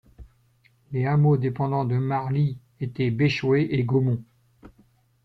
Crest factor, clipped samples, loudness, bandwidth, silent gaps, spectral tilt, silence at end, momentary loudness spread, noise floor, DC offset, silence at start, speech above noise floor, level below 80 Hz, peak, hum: 14 dB; under 0.1%; -24 LUFS; 6.2 kHz; none; -9 dB/octave; 0.55 s; 9 LU; -62 dBFS; under 0.1%; 0.2 s; 40 dB; -56 dBFS; -10 dBFS; none